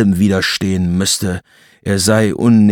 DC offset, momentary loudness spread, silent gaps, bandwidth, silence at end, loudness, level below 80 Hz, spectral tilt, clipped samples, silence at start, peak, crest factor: under 0.1%; 10 LU; none; 18 kHz; 0 s; -14 LUFS; -48 dBFS; -5 dB/octave; under 0.1%; 0 s; -2 dBFS; 12 dB